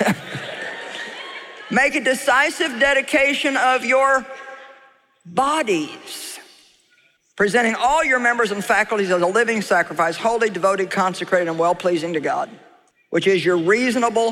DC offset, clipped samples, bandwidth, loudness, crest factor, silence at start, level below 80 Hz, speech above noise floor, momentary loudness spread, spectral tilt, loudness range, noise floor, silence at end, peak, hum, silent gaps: under 0.1%; under 0.1%; 16 kHz; -19 LUFS; 16 dB; 0 s; -56 dBFS; 41 dB; 14 LU; -3.5 dB/octave; 5 LU; -59 dBFS; 0 s; -4 dBFS; none; none